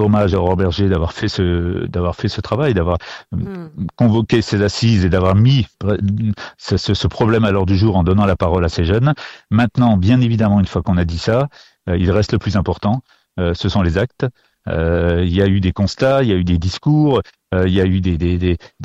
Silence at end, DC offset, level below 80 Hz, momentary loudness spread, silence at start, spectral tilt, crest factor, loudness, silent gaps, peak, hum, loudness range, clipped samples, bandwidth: 0 s; under 0.1%; -32 dBFS; 8 LU; 0 s; -7.5 dB/octave; 12 dB; -16 LUFS; none; -4 dBFS; none; 3 LU; under 0.1%; 8 kHz